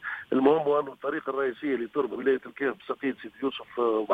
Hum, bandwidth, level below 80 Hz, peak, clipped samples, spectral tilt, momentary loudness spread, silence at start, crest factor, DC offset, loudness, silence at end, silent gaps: none; 4.6 kHz; -70 dBFS; -8 dBFS; under 0.1%; -7.5 dB/octave; 9 LU; 0 s; 20 dB; under 0.1%; -28 LUFS; 0 s; none